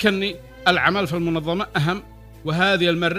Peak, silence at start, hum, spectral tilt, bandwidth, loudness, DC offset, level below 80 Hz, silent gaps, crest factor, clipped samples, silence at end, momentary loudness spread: -2 dBFS; 0 s; none; -5.5 dB/octave; 16 kHz; -21 LUFS; under 0.1%; -46 dBFS; none; 20 dB; under 0.1%; 0 s; 9 LU